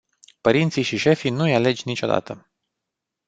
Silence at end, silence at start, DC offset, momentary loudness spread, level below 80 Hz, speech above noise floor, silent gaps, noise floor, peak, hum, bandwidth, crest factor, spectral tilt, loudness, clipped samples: 0.9 s; 0.45 s; under 0.1%; 6 LU; -58 dBFS; 63 dB; none; -83 dBFS; -2 dBFS; none; 9 kHz; 20 dB; -6 dB/octave; -21 LUFS; under 0.1%